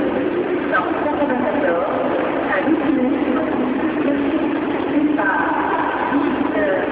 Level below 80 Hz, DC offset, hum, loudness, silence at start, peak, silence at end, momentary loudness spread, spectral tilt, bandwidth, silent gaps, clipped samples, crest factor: -48 dBFS; under 0.1%; none; -19 LUFS; 0 s; -6 dBFS; 0 s; 3 LU; -10 dB/octave; 4 kHz; none; under 0.1%; 12 dB